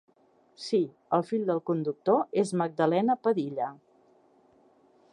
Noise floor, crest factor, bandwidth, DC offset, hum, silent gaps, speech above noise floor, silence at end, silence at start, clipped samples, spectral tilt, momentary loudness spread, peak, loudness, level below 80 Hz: -64 dBFS; 20 dB; 11 kHz; under 0.1%; none; none; 37 dB; 1.35 s; 0.6 s; under 0.1%; -6.5 dB/octave; 7 LU; -10 dBFS; -28 LUFS; -82 dBFS